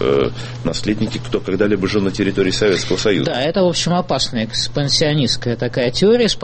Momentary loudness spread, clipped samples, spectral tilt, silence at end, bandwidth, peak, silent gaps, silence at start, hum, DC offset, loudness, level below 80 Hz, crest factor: 7 LU; under 0.1%; -4.5 dB/octave; 0 s; 8.8 kHz; -2 dBFS; none; 0 s; none; under 0.1%; -17 LUFS; -38 dBFS; 16 dB